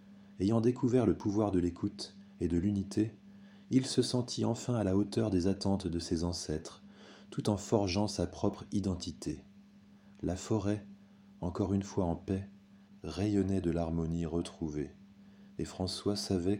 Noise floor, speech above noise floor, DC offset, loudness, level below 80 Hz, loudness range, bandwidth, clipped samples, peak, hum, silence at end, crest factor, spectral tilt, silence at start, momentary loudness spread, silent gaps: -59 dBFS; 26 dB; under 0.1%; -34 LUFS; -54 dBFS; 4 LU; 16 kHz; under 0.1%; -14 dBFS; none; 0 s; 20 dB; -6.5 dB/octave; 0 s; 12 LU; none